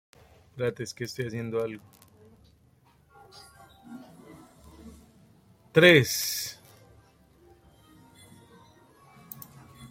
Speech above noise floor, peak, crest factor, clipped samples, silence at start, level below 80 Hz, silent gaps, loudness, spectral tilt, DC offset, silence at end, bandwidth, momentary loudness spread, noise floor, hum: 37 dB; -4 dBFS; 28 dB; under 0.1%; 0.55 s; -64 dBFS; none; -25 LUFS; -4 dB/octave; under 0.1%; 0.05 s; 16.5 kHz; 32 LU; -62 dBFS; none